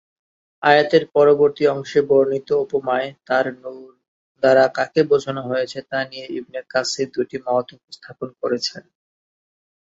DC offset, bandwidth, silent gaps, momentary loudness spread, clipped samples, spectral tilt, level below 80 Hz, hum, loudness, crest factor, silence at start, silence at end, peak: under 0.1%; 8 kHz; 4.08-4.35 s; 15 LU; under 0.1%; -4.5 dB/octave; -66 dBFS; none; -19 LUFS; 18 dB; 0.6 s; 1 s; -2 dBFS